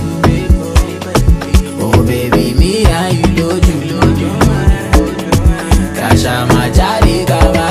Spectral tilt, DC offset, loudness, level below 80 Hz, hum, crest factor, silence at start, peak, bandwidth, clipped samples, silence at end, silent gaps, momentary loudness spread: -6 dB/octave; under 0.1%; -12 LUFS; -14 dBFS; none; 10 dB; 0 s; 0 dBFS; 15.5 kHz; 0.3%; 0 s; none; 3 LU